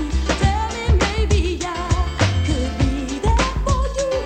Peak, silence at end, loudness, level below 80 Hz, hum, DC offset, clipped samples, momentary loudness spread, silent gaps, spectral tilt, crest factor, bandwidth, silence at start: -4 dBFS; 0 s; -20 LUFS; -22 dBFS; none; under 0.1%; under 0.1%; 4 LU; none; -5.5 dB/octave; 16 dB; 9.4 kHz; 0 s